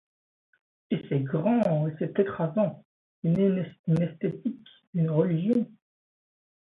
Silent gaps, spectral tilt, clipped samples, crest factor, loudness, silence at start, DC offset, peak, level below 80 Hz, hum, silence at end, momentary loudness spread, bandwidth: 2.85-3.22 s, 3.79-3.84 s, 4.87-4.93 s; -10.5 dB/octave; under 0.1%; 18 dB; -27 LUFS; 0.9 s; under 0.1%; -10 dBFS; -66 dBFS; none; 0.95 s; 9 LU; 4.1 kHz